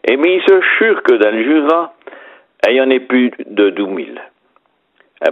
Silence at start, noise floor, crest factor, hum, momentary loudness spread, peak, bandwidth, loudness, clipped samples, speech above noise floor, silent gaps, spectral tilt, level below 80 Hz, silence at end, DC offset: 0.05 s; -58 dBFS; 14 dB; none; 12 LU; 0 dBFS; 6.4 kHz; -12 LUFS; under 0.1%; 46 dB; none; -5.5 dB/octave; -66 dBFS; 0 s; under 0.1%